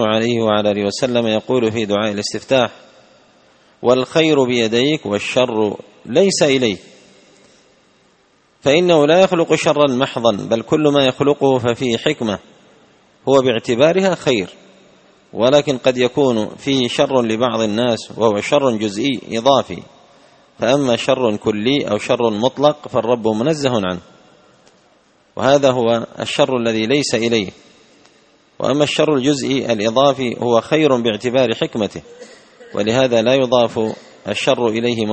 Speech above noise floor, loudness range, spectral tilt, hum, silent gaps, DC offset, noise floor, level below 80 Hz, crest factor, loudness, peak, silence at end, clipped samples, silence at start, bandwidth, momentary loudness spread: 40 dB; 3 LU; -5 dB/octave; none; none; under 0.1%; -56 dBFS; -56 dBFS; 16 dB; -16 LUFS; 0 dBFS; 0 s; under 0.1%; 0 s; 8.8 kHz; 8 LU